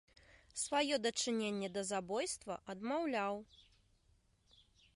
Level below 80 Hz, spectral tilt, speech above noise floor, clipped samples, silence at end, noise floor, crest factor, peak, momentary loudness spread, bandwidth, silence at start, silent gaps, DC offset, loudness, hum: -72 dBFS; -3 dB/octave; 35 dB; under 0.1%; 1.35 s; -73 dBFS; 18 dB; -22 dBFS; 9 LU; 11.5 kHz; 0.55 s; none; under 0.1%; -39 LUFS; none